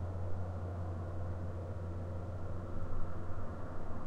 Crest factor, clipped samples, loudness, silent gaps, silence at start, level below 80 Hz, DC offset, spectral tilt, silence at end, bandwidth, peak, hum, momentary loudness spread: 14 dB; under 0.1%; -43 LUFS; none; 0 s; -46 dBFS; under 0.1%; -9 dB/octave; 0 s; 3.9 kHz; -22 dBFS; none; 3 LU